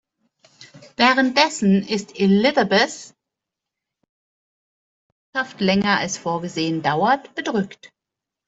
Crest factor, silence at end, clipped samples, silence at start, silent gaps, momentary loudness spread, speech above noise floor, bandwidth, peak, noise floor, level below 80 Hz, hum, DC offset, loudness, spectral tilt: 20 dB; 0.6 s; under 0.1%; 0.6 s; 4.09-5.33 s; 11 LU; 66 dB; 8 kHz; -2 dBFS; -85 dBFS; -60 dBFS; none; under 0.1%; -19 LUFS; -4.5 dB/octave